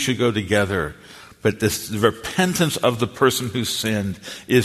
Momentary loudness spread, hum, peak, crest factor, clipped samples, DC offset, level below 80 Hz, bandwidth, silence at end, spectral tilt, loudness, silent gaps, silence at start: 6 LU; none; -2 dBFS; 20 dB; under 0.1%; under 0.1%; -50 dBFS; 14 kHz; 0 s; -4.5 dB/octave; -21 LUFS; none; 0 s